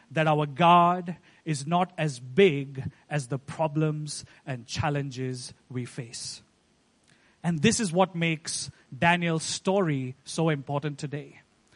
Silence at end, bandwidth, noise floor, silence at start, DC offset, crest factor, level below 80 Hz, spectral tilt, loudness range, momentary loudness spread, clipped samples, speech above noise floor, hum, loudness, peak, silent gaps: 0.45 s; 11 kHz; -66 dBFS; 0.1 s; under 0.1%; 22 dB; -60 dBFS; -5 dB/octave; 8 LU; 15 LU; under 0.1%; 39 dB; none; -27 LUFS; -6 dBFS; none